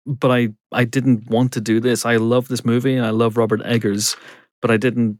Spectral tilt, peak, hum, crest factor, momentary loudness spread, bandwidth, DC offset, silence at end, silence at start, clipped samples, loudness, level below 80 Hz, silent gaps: -5.5 dB/octave; -4 dBFS; none; 14 dB; 4 LU; 17 kHz; under 0.1%; 0.05 s; 0.05 s; under 0.1%; -18 LUFS; -68 dBFS; 4.51-4.62 s